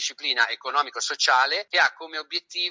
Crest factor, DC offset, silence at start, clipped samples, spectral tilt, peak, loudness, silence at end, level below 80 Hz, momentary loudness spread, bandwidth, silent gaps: 18 dB; under 0.1%; 0 s; under 0.1%; 2 dB/octave; -6 dBFS; -23 LUFS; 0 s; -90 dBFS; 9 LU; 7.8 kHz; none